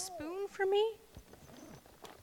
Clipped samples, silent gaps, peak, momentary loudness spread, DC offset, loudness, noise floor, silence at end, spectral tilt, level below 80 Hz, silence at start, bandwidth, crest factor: under 0.1%; none; -22 dBFS; 24 LU; under 0.1%; -35 LUFS; -56 dBFS; 0 s; -3 dB/octave; -68 dBFS; 0 s; 18.5 kHz; 18 dB